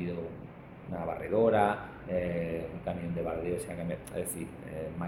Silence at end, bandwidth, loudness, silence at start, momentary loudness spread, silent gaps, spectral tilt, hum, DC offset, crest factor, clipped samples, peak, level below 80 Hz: 0 s; 17 kHz; -33 LUFS; 0 s; 14 LU; none; -6.5 dB/octave; none; under 0.1%; 22 dB; under 0.1%; -12 dBFS; -54 dBFS